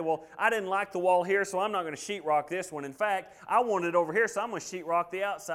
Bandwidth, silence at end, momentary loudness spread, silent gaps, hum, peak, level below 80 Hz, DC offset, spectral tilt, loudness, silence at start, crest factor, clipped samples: 16 kHz; 0 s; 9 LU; none; none; -10 dBFS; -74 dBFS; under 0.1%; -4 dB/octave; -29 LUFS; 0 s; 18 dB; under 0.1%